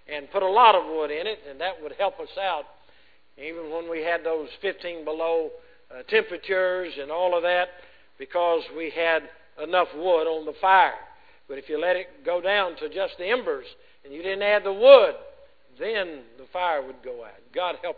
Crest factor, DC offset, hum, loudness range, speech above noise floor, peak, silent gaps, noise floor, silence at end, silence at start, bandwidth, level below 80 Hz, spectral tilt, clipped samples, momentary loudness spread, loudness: 24 dB; 0.2%; none; 9 LU; 36 dB; -2 dBFS; none; -60 dBFS; 0.05 s; 0.1 s; 4.9 kHz; -64 dBFS; -6 dB/octave; under 0.1%; 18 LU; -24 LUFS